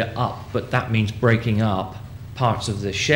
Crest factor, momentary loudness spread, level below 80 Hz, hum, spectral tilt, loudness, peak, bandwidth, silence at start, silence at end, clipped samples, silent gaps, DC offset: 18 dB; 10 LU; -44 dBFS; none; -5.5 dB/octave; -22 LUFS; -4 dBFS; 16 kHz; 0 s; 0 s; under 0.1%; none; under 0.1%